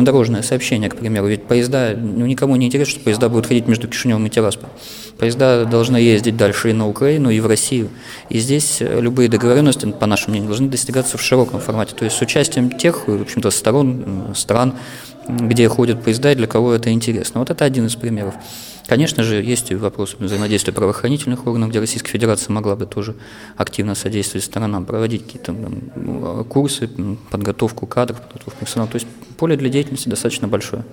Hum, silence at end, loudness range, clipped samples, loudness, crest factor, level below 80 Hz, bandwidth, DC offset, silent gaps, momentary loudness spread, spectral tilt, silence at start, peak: none; 0 s; 6 LU; under 0.1%; -17 LUFS; 16 dB; -48 dBFS; 18.5 kHz; under 0.1%; none; 11 LU; -5 dB/octave; 0 s; 0 dBFS